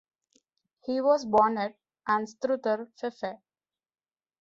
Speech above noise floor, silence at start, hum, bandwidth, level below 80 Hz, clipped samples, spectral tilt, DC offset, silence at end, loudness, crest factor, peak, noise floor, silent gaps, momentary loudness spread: over 63 dB; 0.85 s; none; 7.8 kHz; -70 dBFS; under 0.1%; -5.5 dB/octave; under 0.1%; 1.05 s; -28 LUFS; 20 dB; -10 dBFS; under -90 dBFS; none; 14 LU